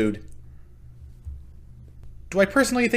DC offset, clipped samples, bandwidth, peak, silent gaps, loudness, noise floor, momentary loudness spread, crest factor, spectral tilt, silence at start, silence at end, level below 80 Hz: under 0.1%; under 0.1%; 15.5 kHz; -4 dBFS; none; -22 LUFS; -44 dBFS; 24 LU; 22 dB; -4.5 dB/octave; 0 s; 0 s; -44 dBFS